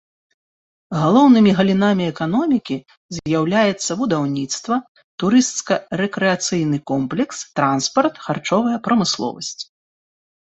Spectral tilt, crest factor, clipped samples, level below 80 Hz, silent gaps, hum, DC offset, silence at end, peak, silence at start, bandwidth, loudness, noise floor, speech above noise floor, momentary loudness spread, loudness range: -5 dB/octave; 16 dB; under 0.1%; -56 dBFS; 2.97-3.09 s, 4.88-4.95 s, 5.04-5.18 s; none; under 0.1%; 0.85 s; -2 dBFS; 0.9 s; 8.2 kHz; -18 LUFS; under -90 dBFS; over 72 dB; 13 LU; 4 LU